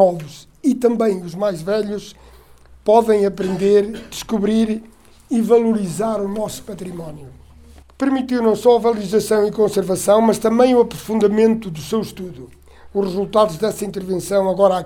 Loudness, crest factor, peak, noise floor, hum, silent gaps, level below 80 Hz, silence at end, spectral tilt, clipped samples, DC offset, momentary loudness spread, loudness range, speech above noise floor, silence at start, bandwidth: -18 LUFS; 18 dB; 0 dBFS; -45 dBFS; none; none; -48 dBFS; 0 s; -6 dB/octave; under 0.1%; under 0.1%; 14 LU; 5 LU; 28 dB; 0 s; 17.5 kHz